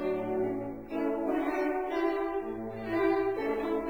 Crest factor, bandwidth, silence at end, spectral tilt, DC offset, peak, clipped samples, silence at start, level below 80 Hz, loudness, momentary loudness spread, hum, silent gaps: 14 dB; over 20 kHz; 0 s; -7 dB/octave; 0.2%; -16 dBFS; under 0.1%; 0 s; -58 dBFS; -32 LUFS; 8 LU; none; none